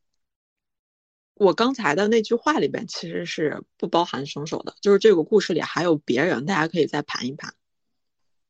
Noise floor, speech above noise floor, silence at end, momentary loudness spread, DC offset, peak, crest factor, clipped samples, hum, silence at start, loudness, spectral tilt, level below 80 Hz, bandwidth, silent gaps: -83 dBFS; 62 dB; 1 s; 12 LU; under 0.1%; -4 dBFS; 20 dB; under 0.1%; none; 1.4 s; -22 LUFS; -5 dB/octave; -68 dBFS; 8.2 kHz; none